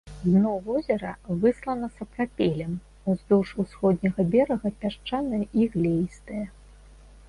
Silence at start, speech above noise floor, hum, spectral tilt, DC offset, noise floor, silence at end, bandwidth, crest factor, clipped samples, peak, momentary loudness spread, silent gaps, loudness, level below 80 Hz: 0.05 s; 24 dB; none; -8.5 dB/octave; under 0.1%; -49 dBFS; 0.8 s; 11 kHz; 16 dB; under 0.1%; -10 dBFS; 10 LU; none; -26 LUFS; -50 dBFS